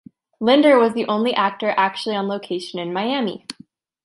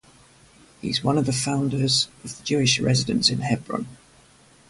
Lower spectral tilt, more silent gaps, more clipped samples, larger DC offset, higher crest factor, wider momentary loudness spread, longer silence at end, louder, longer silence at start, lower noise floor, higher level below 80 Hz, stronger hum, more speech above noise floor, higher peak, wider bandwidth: first, -5.5 dB/octave vs -4 dB/octave; neither; neither; neither; about the same, 18 dB vs 22 dB; about the same, 13 LU vs 12 LU; second, 0.5 s vs 0.75 s; first, -19 LUFS vs -22 LUFS; second, 0.4 s vs 0.85 s; second, -50 dBFS vs -54 dBFS; second, -70 dBFS vs -54 dBFS; neither; about the same, 31 dB vs 31 dB; about the same, -2 dBFS vs -4 dBFS; about the same, 11.5 kHz vs 11.5 kHz